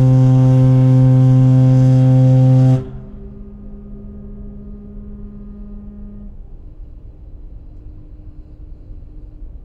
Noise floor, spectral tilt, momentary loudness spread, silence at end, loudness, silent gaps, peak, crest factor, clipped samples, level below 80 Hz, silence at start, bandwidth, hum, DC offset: -35 dBFS; -10.5 dB/octave; 25 LU; 0.05 s; -11 LUFS; none; -2 dBFS; 12 dB; under 0.1%; -34 dBFS; 0 s; 3.4 kHz; none; under 0.1%